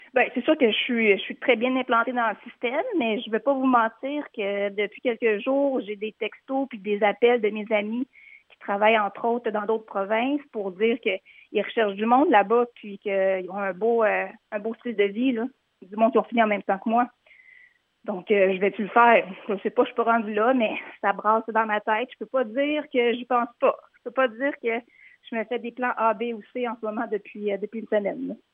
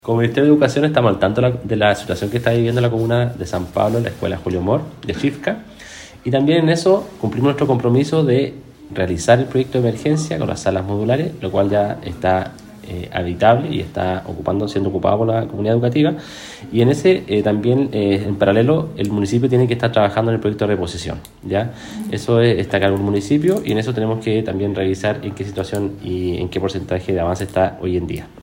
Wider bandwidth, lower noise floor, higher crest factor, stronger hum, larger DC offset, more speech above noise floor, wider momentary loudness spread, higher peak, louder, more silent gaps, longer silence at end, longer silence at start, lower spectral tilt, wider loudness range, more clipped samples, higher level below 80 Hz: second, 3.9 kHz vs 16.5 kHz; first, -57 dBFS vs -38 dBFS; about the same, 20 dB vs 18 dB; neither; neither; first, 33 dB vs 20 dB; about the same, 10 LU vs 10 LU; second, -4 dBFS vs 0 dBFS; second, -24 LUFS vs -18 LUFS; neither; first, 0.15 s vs 0 s; about the same, 0.15 s vs 0.05 s; about the same, -8 dB/octave vs -7 dB/octave; about the same, 4 LU vs 4 LU; neither; second, -84 dBFS vs -46 dBFS